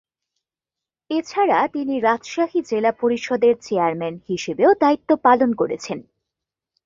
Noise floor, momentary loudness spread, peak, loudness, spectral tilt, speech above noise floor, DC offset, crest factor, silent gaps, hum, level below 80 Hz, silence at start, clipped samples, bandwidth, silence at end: -88 dBFS; 10 LU; -2 dBFS; -20 LUFS; -5.5 dB/octave; 69 dB; under 0.1%; 18 dB; none; none; -64 dBFS; 1.1 s; under 0.1%; 7.6 kHz; 0.85 s